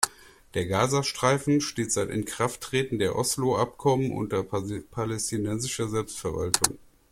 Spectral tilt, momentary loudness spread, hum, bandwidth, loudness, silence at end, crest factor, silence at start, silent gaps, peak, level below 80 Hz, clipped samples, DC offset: -4 dB/octave; 8 LU; none; 16.5 kHz; -27 LUFS; 0.35 s; 28 dB; 0 s; none; 0 dBFS; -54 dBFS; under 0.1%; under 0.1%